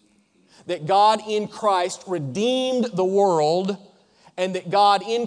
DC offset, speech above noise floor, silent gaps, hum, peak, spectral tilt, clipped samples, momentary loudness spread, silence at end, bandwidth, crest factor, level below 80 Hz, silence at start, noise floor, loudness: under 0.1%; 40 dB; none; none; -6 dBFS; -5 dB/octave; under 0.1%; 11 LU; 0 s; 10 kHz; 14 dB; -72 dBFS; 0.65 s; -60 dBFS; -21 LUFS